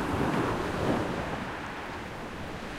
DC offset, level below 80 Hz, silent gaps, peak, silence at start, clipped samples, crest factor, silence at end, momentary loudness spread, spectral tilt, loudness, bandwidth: under 0.1%; -46 dBFS; none; -12 dBFS; 0 s; under 0.1%; 18 dB; 0 s; 10 LU; -6 dB/octave; -32 LUFS; 16.5 kHz